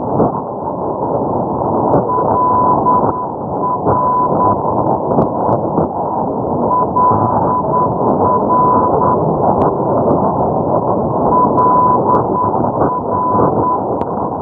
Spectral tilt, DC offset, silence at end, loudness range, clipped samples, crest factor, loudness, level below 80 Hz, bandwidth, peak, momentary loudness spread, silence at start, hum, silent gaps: -13.5 dB/octave; under 0.1%; 0 s; 2 LU; under 0.1%; 12 dB; -14 LUFS; -40 dBFS; 2.3 kHz; 0 dBFS; 6 LU; 0 s; none; none